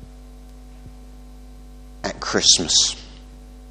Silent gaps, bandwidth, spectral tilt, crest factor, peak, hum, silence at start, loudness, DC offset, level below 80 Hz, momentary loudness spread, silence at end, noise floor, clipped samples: none; 15.5 kHz; -0.5 dB/octave; 24 dB; 0 dBFS; none; 0 s; -16 LUFS; under 0.1%; -42 dBFS; 18 LU; 0 s; -41 dBFS; under 0.1%